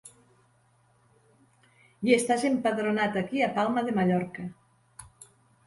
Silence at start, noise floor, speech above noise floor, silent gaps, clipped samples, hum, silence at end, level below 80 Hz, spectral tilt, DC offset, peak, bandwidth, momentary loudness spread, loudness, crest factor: 0.05 s; -65 dBFS; 39 dB; none; under 0.1%; none; 0.4 s; -66 dBFS; -5.5 dB/octave; under 0.1%; -8 dBFS; 11.5 kHz; 14 LU; -27 LUFS; 22 dB